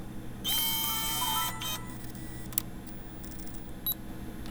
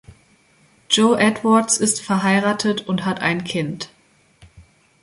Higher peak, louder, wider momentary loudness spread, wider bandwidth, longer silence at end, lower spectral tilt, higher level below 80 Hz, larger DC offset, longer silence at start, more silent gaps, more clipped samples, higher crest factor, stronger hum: about the same, -2 dBFS vs -2 dBFS; second, -31 LUFS vs -18 LUFS; first, 15 LU vs 9 LU; first, over 20 kHz vs 11.5 kHz; second, 0 s vs 0.4 s; second, -2 dB/octave vs -3.5 dB/octave; first, -48 dBFS vs -58 dBFS; neither; about the same, 0 s vs 0.1 s; neither; neither; first, 32 dB vs 18 dB; neither